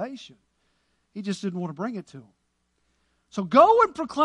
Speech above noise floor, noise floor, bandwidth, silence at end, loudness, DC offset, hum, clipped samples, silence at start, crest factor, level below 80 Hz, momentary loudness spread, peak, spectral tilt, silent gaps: 49 dB; -73 dBFS; 11 kHz; 0 s; -22 LUFS; under 0.1%; none; under 0.1%; 0 s; 22 dB; -66 dBFS; 21 LU; -4 dBFS; -6 dB/octave; none